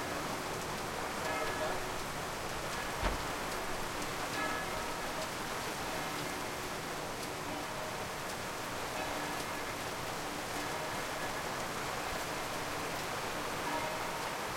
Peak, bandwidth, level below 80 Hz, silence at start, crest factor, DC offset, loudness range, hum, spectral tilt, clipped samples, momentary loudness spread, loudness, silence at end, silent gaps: -20 dBFS; 16.5 kHz; -52 dBFS; 0 s; 18 dB; under 0.1%; 2 LU; none; -3 dB/octave; under 0.1%; 3 LU; -37 LUFS; 0 s; none